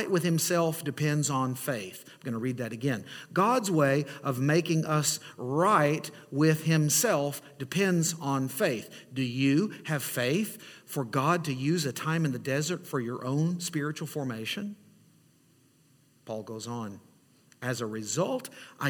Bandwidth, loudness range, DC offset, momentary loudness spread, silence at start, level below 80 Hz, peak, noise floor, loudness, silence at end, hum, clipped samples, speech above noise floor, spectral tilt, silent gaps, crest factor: 19 kHz; 11 LU; under 0.1%; 12 LU; 0 s; -72 dBFS; -12 dBFS; -63 dBFS; -29 LUFS; 0 s; none; under 0.1%; 35 dB; -5 dB/octave; none; 18 dB